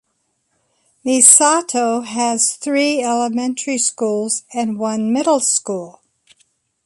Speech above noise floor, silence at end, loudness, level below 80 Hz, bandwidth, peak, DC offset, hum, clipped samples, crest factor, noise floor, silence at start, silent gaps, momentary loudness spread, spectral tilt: 52 dB; 0.95 s; -15 LUFS; -68 dBFS; 16 kHz; 0 dBFS; under 0.1%; none; under 0.1%; 18 dB; -68 dBFS; 1.05 s; none; 12 LU; -2 dB/octave